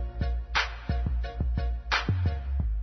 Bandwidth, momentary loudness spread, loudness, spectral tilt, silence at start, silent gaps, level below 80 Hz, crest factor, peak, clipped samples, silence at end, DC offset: 6.4 kHz; 5 LU; -30 LUFS; -5.5 dB/octave; 0 s; none; -30 dBFS; 16 dB; -12 dBFS; under 0.1%; 0 s; under 0.1%